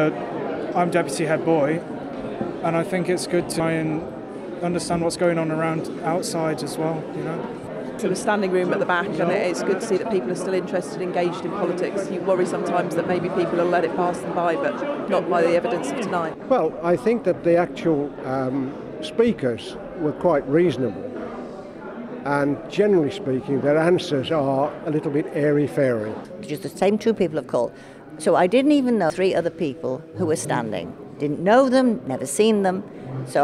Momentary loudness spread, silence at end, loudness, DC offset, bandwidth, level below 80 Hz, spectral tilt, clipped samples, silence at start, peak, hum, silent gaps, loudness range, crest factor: 12 LU; 0 s; -22 LUFS; under 0.1%; 14 kHz; -58 dBFS; -6 dB/octave; under 0.1%; 0 s; -4 dBFS; none; none; 3 LU; 18 dB